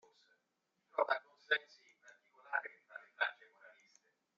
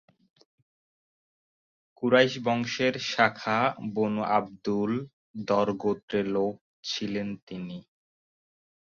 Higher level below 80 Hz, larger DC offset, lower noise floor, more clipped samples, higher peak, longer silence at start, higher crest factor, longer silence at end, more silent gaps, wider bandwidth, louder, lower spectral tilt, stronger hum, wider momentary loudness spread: second, under -90 dBFS vs -68 dBFS; neither; second, -85 dBFS vs under -90 dBFS; neither; second, -20 dBFS vs -6 dBFS; second, 0.95 s vs 2 s; about the same, 24 dB vs 24 dB; second, 0.7 s vs 1.2 s; second, none vs 5.13-5.34 s, 6.03-6.08 s, 6.61-6.83 s, 7.42-7.47 s; about the same, 7.4 kHz vs 7.4 kHz; second, -39 LUFS vs -27 LUFS; second, 4 dB/octave vs -5 dB/octave; neither; first, 18 LU vs 14 LU